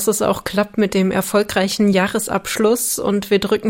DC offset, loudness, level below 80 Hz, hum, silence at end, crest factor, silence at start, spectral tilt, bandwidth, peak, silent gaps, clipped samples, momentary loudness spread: under 0.1%; -18 LUFS; -48 dBFS; none; 0 s; 14 dB; 0 s; -4.5 dB/octave; 16.5 kHz; -2 dBFS; none; under 0.1%; 4 LU